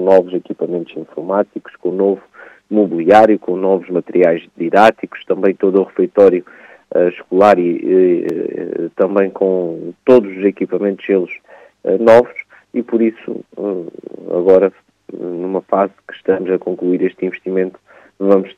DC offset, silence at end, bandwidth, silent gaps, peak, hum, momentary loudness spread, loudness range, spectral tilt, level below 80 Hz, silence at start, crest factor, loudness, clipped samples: under 0.1%; 0.05 s; 8.4 kHz; none; 0 dBFS; none; 13 LU; 4 LU; -8 dB/octave; -60 dBFS; 0 s; 14 dB; -15 LUFS; 0.2%